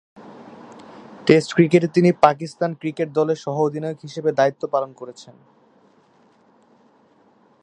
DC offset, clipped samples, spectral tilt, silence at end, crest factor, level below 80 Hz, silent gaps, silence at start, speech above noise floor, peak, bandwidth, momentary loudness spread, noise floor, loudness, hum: under 0.1%; under 0.1%; -7 dB/octave; 2.35 s; 22 dB; -64 dBFS; none; 0.25 s; 37 dB; 0 dBFS; 10 kHz; 26 LU; -56 dBFS; -20 LUFS; none